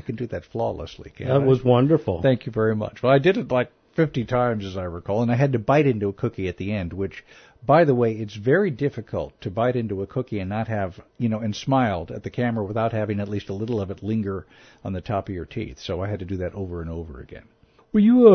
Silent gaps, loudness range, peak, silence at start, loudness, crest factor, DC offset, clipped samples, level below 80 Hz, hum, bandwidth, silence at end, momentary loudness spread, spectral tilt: none; 8 LU; -2 dBFS; 0.05 s; -23 LUFS; 20 dB; under 0.1%; under 0.1%; -50 dBFS; none; 6.6 kHz; 0 s; 14 LU; -8.5 dB/octave